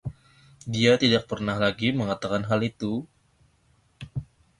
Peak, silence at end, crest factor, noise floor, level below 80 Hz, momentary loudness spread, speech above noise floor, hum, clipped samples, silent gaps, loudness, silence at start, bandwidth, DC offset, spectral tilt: -6 dBFS; 0.35 s; 20 dB; -64 dBFS; -54 dBFS; 17 LU; 40 dB; none; under 0.1%; none; -25 LUFS; 0.05 s; 11.5 kHz; under 0.1%; -5.5 dB/octave